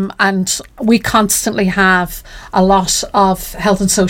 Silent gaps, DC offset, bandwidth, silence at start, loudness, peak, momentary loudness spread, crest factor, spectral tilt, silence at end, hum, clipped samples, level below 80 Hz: none; under 0.1%; 17 kHz; 0 s; -13 LUFS; -2 dBFS; 6 LU; 12 dB; -3.5 dB/octave; 0 s; none; under 0.1%; -34 dBFS